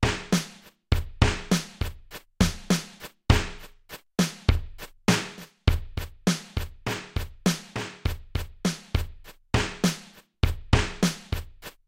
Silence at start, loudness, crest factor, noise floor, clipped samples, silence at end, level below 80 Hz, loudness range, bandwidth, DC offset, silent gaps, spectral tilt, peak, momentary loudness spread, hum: 0 s; -28 LUFS; 22 dB; -47 dBFS; under 0.1%; 0.2 s; -34 dBFS; 3 LU; 16.5 kHz; under 0.1%; none; -5 dB/octave; -4 dBFS; 15 LU; none